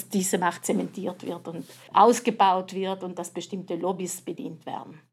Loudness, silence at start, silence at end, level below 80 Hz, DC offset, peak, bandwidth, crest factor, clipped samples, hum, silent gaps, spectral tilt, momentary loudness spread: -26 LUFS; 0 s; 0.15 s; -88 dBFS; under 0.1%; -4 dBFS; 16 kHz; 22 dB; under 0.1%; none; none; -4.5 dB/octave; 17 LU